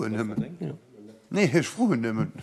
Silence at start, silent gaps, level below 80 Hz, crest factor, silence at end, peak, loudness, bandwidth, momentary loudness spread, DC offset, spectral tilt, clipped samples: 0 s; none; -64 dBFS; 18 dB; 0 s; -10 dBFS; -27 LUFS; 13 kHz; 14 LU; under 0.1%; -6 dB/octave; under 0.1%